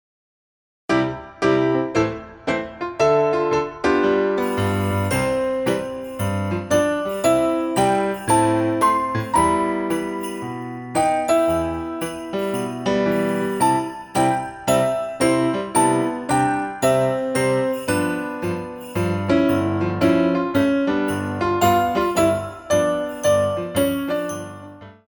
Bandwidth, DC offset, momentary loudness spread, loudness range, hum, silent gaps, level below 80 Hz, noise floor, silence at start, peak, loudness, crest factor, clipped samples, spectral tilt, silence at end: over 20 kHz; under 0.1%; 8 LU; 2 LU; none; none; -48 dBFS; -40 dBFS; 0.9 s; -6 dBFS; -20 LUFS; 16 dB; under 0.1%; -5.5 dB/octave; 0.15 s